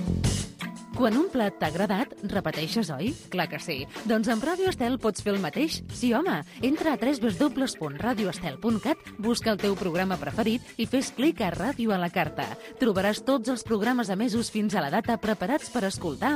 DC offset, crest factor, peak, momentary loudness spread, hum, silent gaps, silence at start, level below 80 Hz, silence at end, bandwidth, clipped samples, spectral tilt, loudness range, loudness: under 0.1%; 16 dB; -12 dBFS; 5 LU; none; none; 0 s; -50 dBFS; 0 s; 15.5 kHz; under 0.1%; -5 dB/octave; 1 LU; -27 LUFS